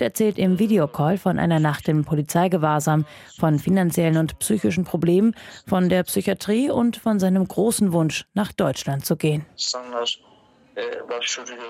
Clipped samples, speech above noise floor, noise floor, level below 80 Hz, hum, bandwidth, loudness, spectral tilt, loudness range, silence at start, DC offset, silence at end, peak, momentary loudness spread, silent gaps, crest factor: under 0.1%; 24 dB; -45 dBFS; -54 dBFS; none; 16 kHz; -21 LUFS; -5.5 dB/octave; 3 LU; 0 s; under 0.1%; 0 s; -4 dBFS; 7 LU; none; 16 dB